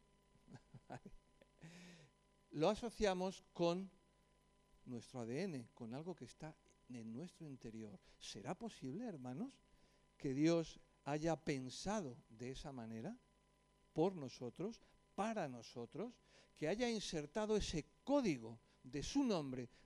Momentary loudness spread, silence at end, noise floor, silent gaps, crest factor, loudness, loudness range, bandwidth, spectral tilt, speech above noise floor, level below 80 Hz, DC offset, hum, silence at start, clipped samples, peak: 18 LU; 0.2 s; -76 dBFS; none; 20 dB; -44 LUFS; 8 LU; 12.5 kHz; -5.5 dB/octave; 32 dB; -66 dBFS; under 0.1%; none; 0.5 s; under 0.1%; -24 dBFS